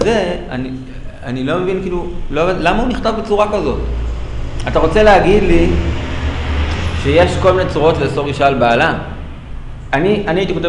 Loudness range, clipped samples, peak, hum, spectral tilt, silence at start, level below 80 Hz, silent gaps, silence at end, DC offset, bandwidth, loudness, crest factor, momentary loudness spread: 4 LU; under 0.1%; 0 dBFS; none; -6.5 dB/octave; 0 s; -24 dBFS; none; 0 s; under 0.1%; 10.5 kHz; -15 LUFS; 14 dB; 14 LU